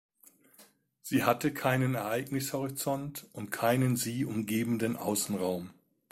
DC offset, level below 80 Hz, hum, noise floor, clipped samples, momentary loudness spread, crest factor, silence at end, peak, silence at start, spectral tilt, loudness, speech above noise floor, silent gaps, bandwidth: under 0.1%; -66 dBFS; none; -62 dBFS; under 0.1%; 11 LU; 22 dB; 0.4 s; -10 dBFS; 0.6 s; -5 dB/octave; -31 LUFS; 31 dB; none; 16.5 kHz